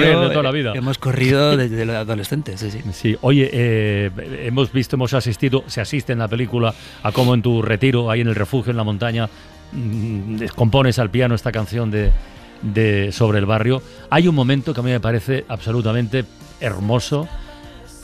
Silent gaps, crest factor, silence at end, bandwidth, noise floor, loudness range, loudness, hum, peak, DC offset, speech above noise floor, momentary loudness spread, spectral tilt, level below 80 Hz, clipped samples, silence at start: none; 14 dB; 0 s; 14.5 kHz; -38 dBFS; 2 LU; -19 LUFS; none; -4 dBFS; under 0.1%; 20 dB; 10 LU; -6.5 dB/octave; -32 dBFS; under 0.1%; 0 s